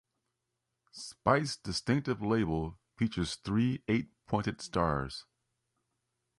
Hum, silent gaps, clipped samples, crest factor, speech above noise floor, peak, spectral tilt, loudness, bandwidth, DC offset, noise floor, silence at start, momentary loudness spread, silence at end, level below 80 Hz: none; none; under 0.1%; 24 dB; 53 dB; -10 dBFS; -6 dB/octave; -33 LUFS; 11.5 kHz; under 0.1%; -85 dBFS; 0.95 s; 13 LU; 1.15 s; -54 dBFS